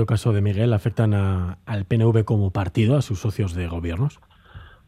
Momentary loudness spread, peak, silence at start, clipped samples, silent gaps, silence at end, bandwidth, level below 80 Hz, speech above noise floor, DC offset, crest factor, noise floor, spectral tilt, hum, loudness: 8 LU; -6 dBFS; 0 s; under 0.1%; none; 0.2 s; 11.5 kHz; -46 dBFS; 24 dB; under 0.1%; 16 dB; -44 dBFS; -8 dB/octave; none; -22 LUFS